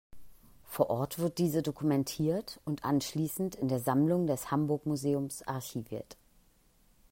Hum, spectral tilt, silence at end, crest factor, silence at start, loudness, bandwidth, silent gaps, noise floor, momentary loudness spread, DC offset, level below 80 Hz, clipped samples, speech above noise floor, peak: none; -6.5 dB/octave; 1 s; 22 dB; 0.15 s; -32 LUFS; 16.5 kHz; none; -66 dBFS; 10 LU; under 0.1%; -64 dBFS; under 0.1%; 34 dB; -12 dBFS